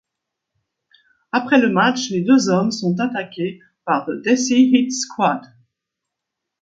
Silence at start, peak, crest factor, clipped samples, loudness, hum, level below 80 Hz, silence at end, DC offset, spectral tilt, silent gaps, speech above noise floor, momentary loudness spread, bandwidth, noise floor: 1.35 s; -2 dBFS; 18 dB; under 0.1%; -18 LUFS; none; -68 dBFS; 1.15 s; under 0.1%; -4.5 dB/octave; none; 64 dB; 12 LU; 7.8 kHz; -81 dBFS